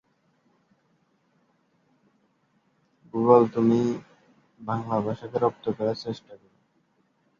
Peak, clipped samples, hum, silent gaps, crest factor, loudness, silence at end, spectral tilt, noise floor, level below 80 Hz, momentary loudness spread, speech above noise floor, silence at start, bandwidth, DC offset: -4 dBFS; under 0.1%; none; none; 24 dB; -25 LUFS; 1.05 s; -8.5 dB/octave; -68 dBFS; -68 dBFS; 17 LU; 44 dB; 3.15 s; 7.2 kHz; under 0.1%